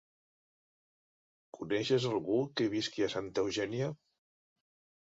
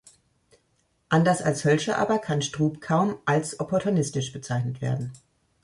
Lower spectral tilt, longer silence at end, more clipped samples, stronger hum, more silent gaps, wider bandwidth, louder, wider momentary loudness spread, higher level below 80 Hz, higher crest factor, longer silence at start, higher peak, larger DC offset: about the same, -5 dB/octave vs -5.5 dB/octave; first, 1.1 s vs 0.45 s; neither; neither; neither; second, 7.8 kHz vs 11.5 kHz; second, -34 LUFS vs -25 LUFS; about the same, 7 LU vs 7 LU; second, -70 dBFS vs -60 dBFS; about the same, 18 dB vs 18 dB; first, 1.55 s vs 1.1 s; second, -18 dBFS vs -8 dBFS; neither